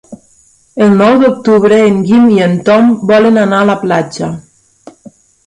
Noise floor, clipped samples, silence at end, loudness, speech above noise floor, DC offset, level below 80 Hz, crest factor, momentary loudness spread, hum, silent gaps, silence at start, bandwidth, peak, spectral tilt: -48 dBFS; under 0.1%; 1.05 s; -8 LUFS; 40 dB; under 0.1%; -50 dBFS; 10 dB; 12 LU; none; none; 0.1 s; 10.5 kHz; 0 dBFS; -7 dB/octave